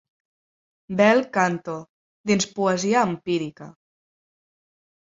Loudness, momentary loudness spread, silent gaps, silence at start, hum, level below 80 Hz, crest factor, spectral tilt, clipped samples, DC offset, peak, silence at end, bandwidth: -22 LUFS; 16 LU; 1.89-2.24 s; 0.9 s; none; -66 dBFS; 20 dB; -4.5 dB/octave; under 0.1%; under 0.1%; -4 dBFS; 1.4 s; 7.8 kHz